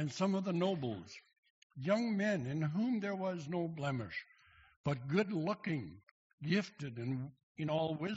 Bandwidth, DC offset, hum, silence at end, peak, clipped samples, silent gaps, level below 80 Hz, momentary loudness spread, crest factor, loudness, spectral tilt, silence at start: 7.6 kHz; under 0.1%; none; 0 s; -20 dBFS; under 0.1%; 1.38-1.43 s, 1.50-1.70 s, 4.76-4.84 s, 6.11-6.38 s, 7.43-7.55 s; -72 dBFS; 12 LU; 18 dB; -38 LUFS; -6 dB/octave; 0 s